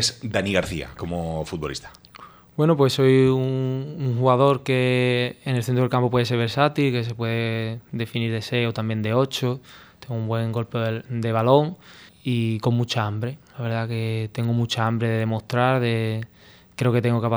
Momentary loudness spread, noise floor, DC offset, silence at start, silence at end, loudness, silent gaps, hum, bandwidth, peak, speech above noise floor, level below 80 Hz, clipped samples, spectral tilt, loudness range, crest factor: 12 LU; -46 dBFS; under 0.1%; 0 s; 0 s; -23 LUFS; none; none; over 20 kHz; -2 dBFS; 24 dB; -52 dBFS; under 0.1%; -6 dB/octave; 5 LU; 20 dB